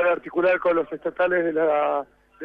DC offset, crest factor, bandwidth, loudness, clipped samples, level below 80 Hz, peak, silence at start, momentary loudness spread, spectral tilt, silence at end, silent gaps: under 0.1%; 12 dB; 4.7 kHz; -23 LUFS; under 0.1%; -62 dBFS; -10 dBFS; 0 s; 9 LU; -7.5 dB/octave; 0 s; none